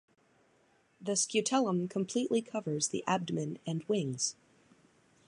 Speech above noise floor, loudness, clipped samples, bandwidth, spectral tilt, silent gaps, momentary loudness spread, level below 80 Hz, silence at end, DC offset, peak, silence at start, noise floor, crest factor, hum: 36 dB; -33 LUFS; under 0.1%; 11.5 kHz; -4 dB/octave; none; 7 LU; -80 dBFS; 0.95 s; under 0.1%; -16 dBFS; 1 s; -69 dBFS; 20 dB; none